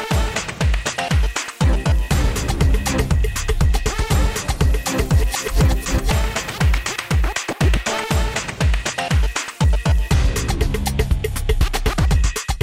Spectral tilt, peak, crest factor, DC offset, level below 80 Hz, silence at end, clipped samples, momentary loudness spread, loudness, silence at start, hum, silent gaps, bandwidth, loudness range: -4.5 dB/octave; -6 dBFS; 12 dB; 0.1%; -20 dBFS; 0 s; under 0.1%; 3 LU; -20 LUFS; 0 s; none; none; 16 kHz; 1 LU